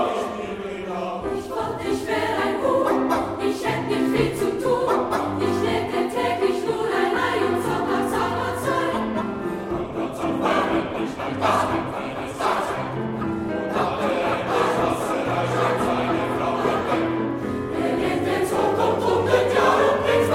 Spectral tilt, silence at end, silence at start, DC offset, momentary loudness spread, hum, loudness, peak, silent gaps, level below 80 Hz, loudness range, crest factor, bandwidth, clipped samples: -5.5 dB/octave; 0 s; 0 s; under 0.1%; 7 LU; none; -23 LUFS; -6 dBFS; none; -48 dBFS; 2 LU; 18 dB; 16 kHz; under 0.1%